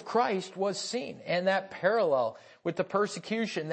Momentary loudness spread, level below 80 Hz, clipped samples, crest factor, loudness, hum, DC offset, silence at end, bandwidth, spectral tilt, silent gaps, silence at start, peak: 8 LU; -80 dBFS; under 0.1%; 18 dB; -30 LUFS; none; under 0.1%; 0 s; 8.8 kHz; -4.5 dB/octave; none; 0 s; -12 dBFS